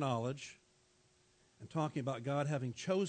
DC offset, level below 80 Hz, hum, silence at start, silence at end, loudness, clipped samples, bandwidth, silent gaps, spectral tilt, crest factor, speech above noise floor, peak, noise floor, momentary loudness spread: under 0.1%; -80 dBFS; none; 0 s; 0 s; -39 LUFS; under 0.1%; 9 kHz; none; -6.5 dB/octave; 18 dB; 34 dB; -22 dBFS; -71 dBFS; 12 LU